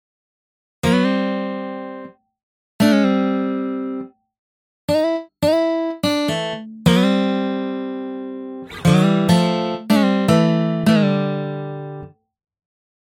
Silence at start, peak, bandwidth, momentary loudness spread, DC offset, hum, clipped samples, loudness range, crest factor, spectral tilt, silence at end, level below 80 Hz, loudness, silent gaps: 0.85 s; -2 dBFS; 16.5 kHz; 15 LU; under 0.1%; none; under 0.1%; 5 LU; 18 dB; -6.5 dB/octave; 0.95 s; -50 dBFS; -19 LUFS; 2.43-2.79 s, 4.39-4.88 s